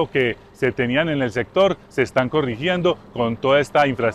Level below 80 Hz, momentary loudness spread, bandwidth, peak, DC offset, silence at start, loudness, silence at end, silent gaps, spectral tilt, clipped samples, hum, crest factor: -50 dBFS; 6 LU; 12.5 kHz; -6 dBFS; under 0.1%; 0 s; -20 LUFS; 0 s; none; -6 dB/octave; under 0.1%; none; 14 dB